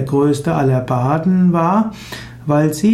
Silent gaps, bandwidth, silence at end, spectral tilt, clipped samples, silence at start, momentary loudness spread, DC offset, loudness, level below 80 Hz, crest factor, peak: none; 15 kHz; 0 s; -7.5 dB/octave; under 0.1%; 0 s; 12 LU; under 0.1%; -15 LUFS; -46 dBFS; 12 dB; -4 dBFS